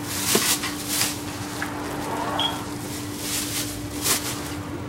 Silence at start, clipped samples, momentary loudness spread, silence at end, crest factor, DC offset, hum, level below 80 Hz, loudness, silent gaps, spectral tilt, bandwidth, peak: 0 s; under 0.1%; 10 LU; 0 s; 22 dB; under 0.1%; none; -48 dBFS; -25 LUFS; none; -2.5 dB/octave; 16 kHz; -6 dBFS